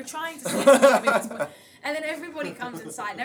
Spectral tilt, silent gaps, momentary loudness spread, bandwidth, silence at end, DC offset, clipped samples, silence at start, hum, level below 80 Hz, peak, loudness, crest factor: -3.5 dB/octave; none; 18 LU; over 20 kHz; 0 s; under 0.1%; under 0.1%; 0 s; none; -74 dBFS; -2 dBFS; -22 LUFS; 22 dB